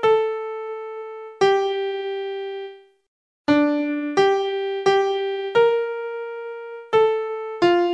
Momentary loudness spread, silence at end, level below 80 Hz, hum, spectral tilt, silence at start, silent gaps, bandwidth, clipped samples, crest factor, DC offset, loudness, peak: 14 LU; 0 s; -66 dBFS; none; -5 dB/octave; 0 s; 3.08-3.45 s; 8.8 kHz; under 0.1%; 16 dB; under 0.1%; -22 LUFS; -6 dBFS